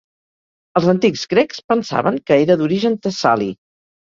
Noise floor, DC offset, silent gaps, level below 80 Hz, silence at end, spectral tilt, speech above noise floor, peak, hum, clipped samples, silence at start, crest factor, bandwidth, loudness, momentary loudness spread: under -90 dBFS; under 0.1%; 1.64-1.68 s; -58 dBFS; 0.6 s; -6 dB/octave; over 74 dB; 0 dBFS; none; under 0.1%; 0.75 s; 16 dB; 7.6 kHz; -17 LUFS; 6 LU